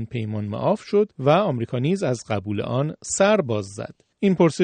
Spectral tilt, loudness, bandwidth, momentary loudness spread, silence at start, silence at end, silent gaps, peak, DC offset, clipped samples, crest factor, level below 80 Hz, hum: -6 dB/octave; -22 LUFS; 9.4 kHz; 9 LU; 0 s; 0 s; none; -6 dBFS; under 0.1%; under 0.1%; 16 dB; -60 dBFS; none